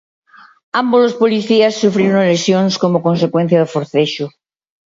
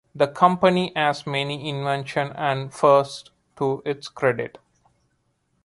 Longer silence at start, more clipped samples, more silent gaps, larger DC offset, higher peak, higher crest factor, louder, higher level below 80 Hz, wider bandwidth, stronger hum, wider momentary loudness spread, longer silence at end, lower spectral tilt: first, 0.75 s vs 0.15 s; neither; neither; neither; about the same, 0 dBFS vs -2 dBFS; second, 14 dB vs 22 dB; first, -14 LUFS vs -22 LUFS; about the same, -62 dBFS vs -64 dBFS; second, 7.8 kHz vs 11.5 kHz; neither; second, 6 LU vs 12 LU; second, 0.65 s vs 1.15 s; about the same, -6 dB/octave vs -6 dB/octave